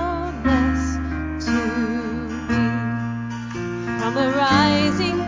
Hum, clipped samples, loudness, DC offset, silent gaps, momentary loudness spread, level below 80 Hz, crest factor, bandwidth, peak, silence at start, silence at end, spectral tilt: none; under 0.1%; -22 LUFS; under 0.1%; none; 11 LU; -34 dBFS; 18 dB; 7.6 kHz; -4 dBFS; 0 s; 0 s; -6 dB/octave